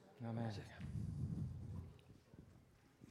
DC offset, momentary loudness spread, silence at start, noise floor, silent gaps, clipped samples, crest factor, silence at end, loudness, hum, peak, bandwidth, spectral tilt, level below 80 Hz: under 0.1%; 20 LU; 0 s; -68 dBFS; none; under 0.1%; 18 dB; 0 s; -48 LUFS; none; -32 dBFS; 12 kHz; -8 dB/octave; -62 dBFS